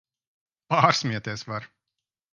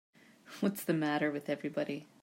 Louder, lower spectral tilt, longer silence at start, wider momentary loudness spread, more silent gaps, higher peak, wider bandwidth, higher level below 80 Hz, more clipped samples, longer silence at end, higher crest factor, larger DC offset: first, -24 LUFS vs -35 LUFS; second, -4.5 dB/octave vs -6 dB/octave; first, 0.7 s vs 0.45 s; first, 15 LU vs 7 LU; neither; first, -2 dBFS vs -18 dBFS; second, 10 kHz vs 16 kHz; first, -66 dBFS vs -82 dBFS; neither; first, 0.65 s vs 0.15 s; first, 26 dB vs 18 dB; neither